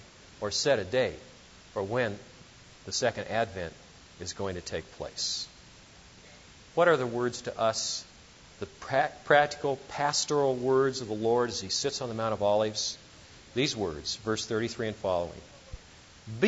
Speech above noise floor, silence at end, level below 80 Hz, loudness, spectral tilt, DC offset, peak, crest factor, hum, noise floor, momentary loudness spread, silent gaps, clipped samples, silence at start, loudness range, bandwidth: 24 dB; 0 s; -58 dBFS; -30 LUFS; -3.5 dB/octave; under 0.1%; -8 dBFS; 22 dB; none; -53 dBFS; 16 LU; none; under 0.1%; 0 s; 7 LU; 8 kHz